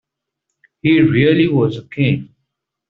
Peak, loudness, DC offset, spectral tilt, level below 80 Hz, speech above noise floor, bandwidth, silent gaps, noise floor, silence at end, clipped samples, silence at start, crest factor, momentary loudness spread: -2 dBFS; -15 LUFS; under 0.1%; -6.5 dB/octave; -50 dBFS; 63 dB; 4.7 kHz; none; -77 dBFS; 0.65 s; under 0.1%; 0.85 s; 14 dB; 8 LU